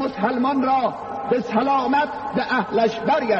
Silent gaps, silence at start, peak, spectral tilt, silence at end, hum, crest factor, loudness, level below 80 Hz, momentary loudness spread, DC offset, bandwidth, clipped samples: none; 0 s; -6 dBFS; -6.5 dB/octave; 0 s; none; 14 dB; -21 LUFS; -58 dBFS; 5 LU; under 0.1%; 7.6 kHz; under 0.1%